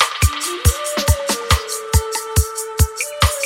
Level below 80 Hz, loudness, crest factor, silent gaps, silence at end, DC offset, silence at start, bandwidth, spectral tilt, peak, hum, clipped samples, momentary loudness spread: -24 dBFS; -18 LUFS; 18 dB; none; 0 s; under 0.1%; 0 s; 17 kHz; -3 dB/octave; 0 dBFS; none; under 0.1%; 2 LU